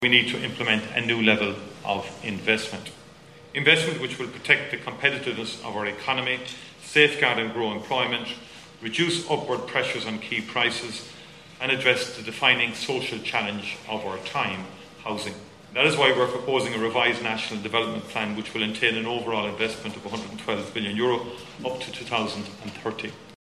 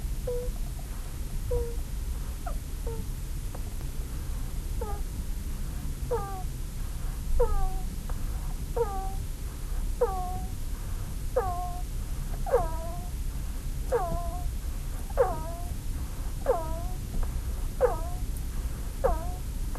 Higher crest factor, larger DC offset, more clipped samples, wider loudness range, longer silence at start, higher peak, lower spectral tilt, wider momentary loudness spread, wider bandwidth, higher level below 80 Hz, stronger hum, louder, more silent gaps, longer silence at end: first, 24 dB vs 18 dB; neither; neither; about the same, 4 LU vs 4 LU; about the same, 0 s vs 0 s; first, -2 dBFS vs -12 dBFS; second, -3.5 dB/octave vs -6 dB/octave; first, 15 LU vs 9 LU; about the same, 13.5 kHz vs 13 kHz; second, -64 dBFS vs -32 dBFS; neither; first, -25 LUFS vs -34 LUFS; neither; about the same, 0.05 s vs 0 s